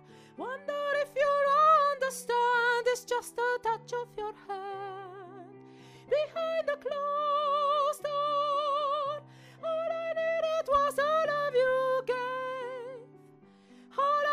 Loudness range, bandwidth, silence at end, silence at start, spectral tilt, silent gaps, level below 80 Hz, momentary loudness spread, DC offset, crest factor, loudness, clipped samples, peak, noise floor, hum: 8 LU; 15.5 kHz; 0 s; 0.1 s; -2.5 dB/octave; none; -70 dBFS; 14 LU; under 0.1%; 16 dB; -29 LUFS; under 0.1%; -14 dBFS; -57 dBFS; none